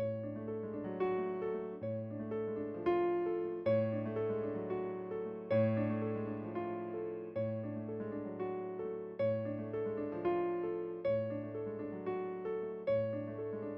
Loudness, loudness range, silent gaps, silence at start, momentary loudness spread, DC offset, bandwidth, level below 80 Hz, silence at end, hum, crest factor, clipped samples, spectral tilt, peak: -38 LUFS; 4 LU; none; 0 s; 8 LU; under 0.1%; 5.6 kHz; -72 dBFS; 0 s; none; 16 dB; under 0.1%; -8 dB/octave; -22 dBFS